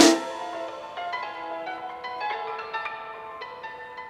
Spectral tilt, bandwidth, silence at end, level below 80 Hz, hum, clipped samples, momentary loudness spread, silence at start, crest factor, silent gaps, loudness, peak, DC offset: -1.5 dB/octave; 16 kHz; 0 s; -70 dBFS; none; under 0.1%; 8 LU; 0 s; 26 dB; none; -31 LUFS; -2 dBFS; under 0.1%